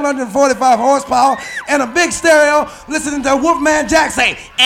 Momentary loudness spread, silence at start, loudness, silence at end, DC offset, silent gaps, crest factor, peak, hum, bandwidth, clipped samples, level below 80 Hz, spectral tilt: 7 LU; 0 s; -13 LUFS; 0 s; under 0.1%; none; 12 dB; -2 dBFS; none; 16.5 kHz; under 0.1%; -42 dBFS; -2 dB/octave